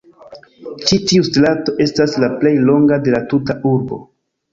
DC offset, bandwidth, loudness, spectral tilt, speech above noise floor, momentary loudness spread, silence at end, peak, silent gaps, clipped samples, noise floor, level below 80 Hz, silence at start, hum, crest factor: under 0.1%; 7.6 kHz; -14 LUFS; -5.5 dB/octave; 26 dB; 10 LU; 0.5 s; 0 dBFS; none; under 0.1%; -40 dBFS; -48 dBFS; 0.3 s; none; 14 dB